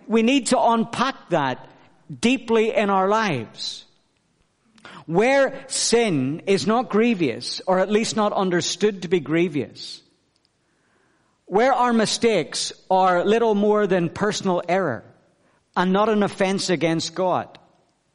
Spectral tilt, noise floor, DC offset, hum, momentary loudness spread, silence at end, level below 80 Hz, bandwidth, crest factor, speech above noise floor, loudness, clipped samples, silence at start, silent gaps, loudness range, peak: -4.5 dB/octave; -66 dBFS; under 0.1%; none; 9 LU; 0.65 s; -60 dBFS; 10.5 kHz; 18 dB; 45 dB; -21 LUFS; under 0.1%; 0.05 s; none; 3 LU; -4 dBFS